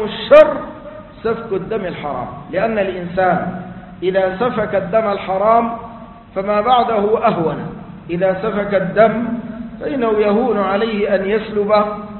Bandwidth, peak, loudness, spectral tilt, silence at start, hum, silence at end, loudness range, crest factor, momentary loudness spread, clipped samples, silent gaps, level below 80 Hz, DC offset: 4.4 kHz; 0 dBFS; -16 LUFS; -8.5 dB/octave; 0 s; none; 0 s; 3 LU; 16 dB; 13 LU; under 0.1%; none; -44 dBFS; under 0.1%